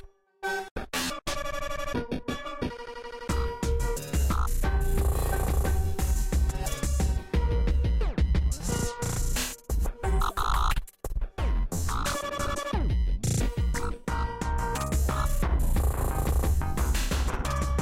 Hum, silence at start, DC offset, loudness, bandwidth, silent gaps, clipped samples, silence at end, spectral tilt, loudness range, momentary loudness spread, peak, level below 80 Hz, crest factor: none; 0.05 s; under 0.1%; -30 LUFS; 16.5 kHz; 0.71-0.76 s; under 0.1%; 0 s; -5 dB/octave; 3 LU; 6 LU; -16 dBFS; -28 dBFS; 12 dB